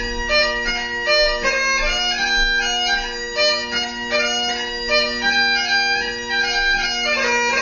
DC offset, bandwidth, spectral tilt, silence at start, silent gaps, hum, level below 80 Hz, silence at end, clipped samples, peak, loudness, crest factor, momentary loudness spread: under 0.1%; 7.2 kHz; -0.5 dB/octave; 0 s; none; none; -34 dBFS; 0 s; under 0.1%; -6 dBFS; -17 LUFS; 14 dB; 5 LU